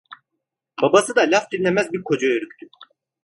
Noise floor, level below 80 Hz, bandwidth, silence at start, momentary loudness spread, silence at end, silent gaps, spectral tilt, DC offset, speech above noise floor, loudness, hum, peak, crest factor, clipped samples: -80 dBFS; -64 dBFS; 11.5 kHz; 0.1 s; 9 LU; 0.4 s; none; -4 dB/octave; under 0.1%; 61 dB; -19 LUFS; none; 0 dBFS; 20 dB; under 0.1%